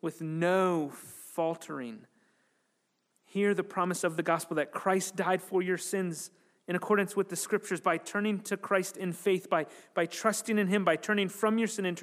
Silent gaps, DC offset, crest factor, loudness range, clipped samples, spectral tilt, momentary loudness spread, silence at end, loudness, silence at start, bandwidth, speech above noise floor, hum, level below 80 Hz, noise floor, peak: none; under 0.1%; 20 dB; 4 LU; under 0.1%; -4.5 dB/octave; 11 LU; 0 s; -31 LUFS; 0.05 s; 15.5 kHz; 47 dB; none; -90 dBFS; -77 dBFS; -12 dBFS